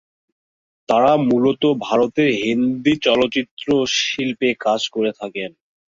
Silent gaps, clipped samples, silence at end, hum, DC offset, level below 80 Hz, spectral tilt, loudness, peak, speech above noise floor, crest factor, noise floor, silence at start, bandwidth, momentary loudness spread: 3.51-3.57 s; under 0.1%; 0.45 s; none; under 0.1%; -56 dBFS; -4.5 dB/octave; -18 LUFS; -2 dBFS; over 72 dB; 16 dB; under -90 dBFS; 0.9 s; 7.6 kHz; 8 LU